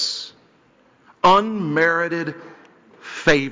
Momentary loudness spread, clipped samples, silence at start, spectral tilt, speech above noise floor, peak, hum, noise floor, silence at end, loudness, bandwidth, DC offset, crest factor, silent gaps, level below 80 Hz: 19 LU; under 0.1%; 0 s; -4.5 dB/octave; 37 dB; -4 dBFS; none; -56 dBFS; 0 s; -19 LUFS; 7.6 kHz; under 0.1%; 16 dB; none; -52 dBFS